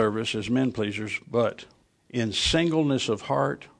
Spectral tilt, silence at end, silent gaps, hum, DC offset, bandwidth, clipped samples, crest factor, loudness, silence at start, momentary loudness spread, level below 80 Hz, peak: -5 dB/octave; 0.15 s; none; none; under 0.1%; 10.5 kHz; under 0.1%; 18 dB; -26 LUFS; 0 s; 8 LU; -48 dBFS; -10 dBFS